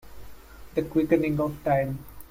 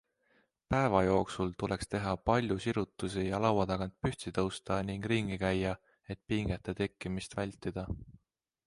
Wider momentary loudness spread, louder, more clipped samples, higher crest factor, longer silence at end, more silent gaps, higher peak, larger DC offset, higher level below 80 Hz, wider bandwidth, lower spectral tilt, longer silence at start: about the same, 9 LU vs 9 LU; first, -26 LUFS vs -34 LUFS; neither; about the same, 20 dB vs 22 dB; second, 0.05 s vs 0.55 s; neither; first, -8 dBFS vs -12 dBFS; neither; about the same, -48 dBFS vs -52 dBFS; first, 16.5 kHz vs 11.5 kHz; first, -8.5 dB/octave vs -6.5 dB/octave; second, 0.05 s vs 0.7 s